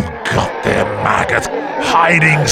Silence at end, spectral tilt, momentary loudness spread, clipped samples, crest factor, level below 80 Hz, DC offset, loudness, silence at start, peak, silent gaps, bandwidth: 0 s; -4.5 dB/octave; 8 LU; under 0.1%; 14 dB; -38 dBFS; under 0.1%; -14 LUFS; 0 s; 0 dBFS; none; 14.5 kHz